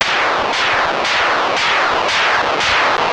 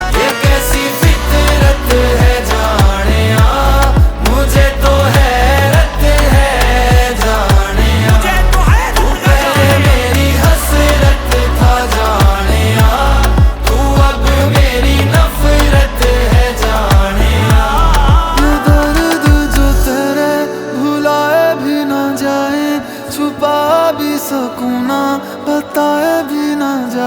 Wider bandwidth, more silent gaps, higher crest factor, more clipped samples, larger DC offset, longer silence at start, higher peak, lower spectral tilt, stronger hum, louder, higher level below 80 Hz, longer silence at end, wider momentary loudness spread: second, 11.5 kHz vs over 20 kHz; neither; about the same, 14 dB vs 10 dB; neither; first, 0.1% vs under 0.1%; about the same, 0 s vs 0 s; about the same, 0 dBFS vs 0 dBFS; second, -1.5 dB/octave vs -5.5 dB/octave; neither; second, -14 LUFS vs -11 LUFS; second, -46 dBFS vs -14 dBFS; about the same, 0 s vs 0 s; second, 2 LU vs 5 LU